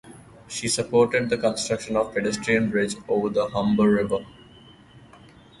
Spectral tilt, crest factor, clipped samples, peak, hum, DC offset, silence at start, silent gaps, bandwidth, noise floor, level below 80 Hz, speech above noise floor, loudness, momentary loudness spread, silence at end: -4.5 dB/octave; 18 dB; under 0.1%; -8 dBFS; none; under 0.1%; 0.05 s; none; 11.5 kHz; -50 dBFS; -54 dBFS; 27 dB; -23 LUFS; 7 LU; 0.6 s